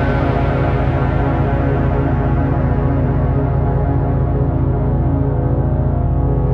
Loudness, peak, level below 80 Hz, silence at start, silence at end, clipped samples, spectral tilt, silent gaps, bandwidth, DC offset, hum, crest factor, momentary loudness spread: -17 LUFS; -4 dBFS; -22 dBFS; 0 s; 0 s; under 0.1%; -11 dB/octave; none; 4.7 kHz; under 0.1%; none; 10 dB; 1 LU